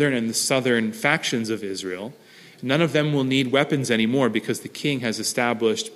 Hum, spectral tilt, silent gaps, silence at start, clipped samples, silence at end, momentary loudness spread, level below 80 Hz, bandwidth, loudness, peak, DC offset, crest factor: none; -4 dB/octave; none; 0 s; under 0.1%; 0 s; 9 LU; -66 dBFS; 15.5 kHz; -22 LUFS; -4 dBFS; under 0.1%; 20 dB